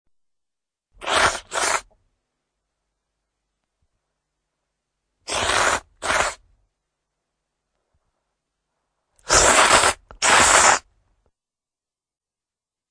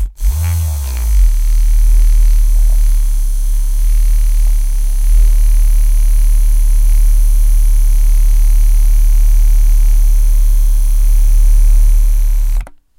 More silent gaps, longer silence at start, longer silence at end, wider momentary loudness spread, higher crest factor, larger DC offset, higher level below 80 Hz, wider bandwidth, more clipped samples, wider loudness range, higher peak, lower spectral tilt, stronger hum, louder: neither; first, 1 s vs 0 s; first, 2.1 s vs 0.35 s; first, 12 LU vs 5 LU; first, 22 dB vs 8 dB; neither; second, -46 dBFS vs -8 dBFS; second, 10.5 kHz vs 16 kHz; neither; first, 13 LU vs 2 LU; about the same, -2 dBFS vs 0 dBFS; second, -0.5 dB/octave vs -4.5 dB/octave; neither; about the same, -17 LUFS vs -15 LUFS